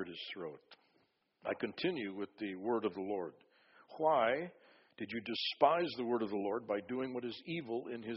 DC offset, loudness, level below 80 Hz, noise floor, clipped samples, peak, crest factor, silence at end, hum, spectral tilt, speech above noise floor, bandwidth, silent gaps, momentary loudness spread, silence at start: under 0.1%; -37 LUFS; -80 dBFS; -76 dBFS; under 0.1%; -14 dBFS; 24 dB; 0 s; none; -3 dB/octave; 39 dB; 5.8 kHz; none; 15 LU; 0 s